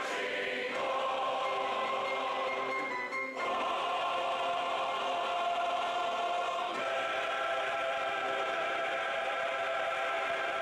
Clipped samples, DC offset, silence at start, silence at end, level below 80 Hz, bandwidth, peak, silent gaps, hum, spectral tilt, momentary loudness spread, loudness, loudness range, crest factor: under 0.1%; under 0.1%; 0 s; 0 s; -74 dBFS; 14 kHz; -24 dBFS; none; none; -2 dB/octave; 1 LU; -33 LUFS; 1 LU; 8 dB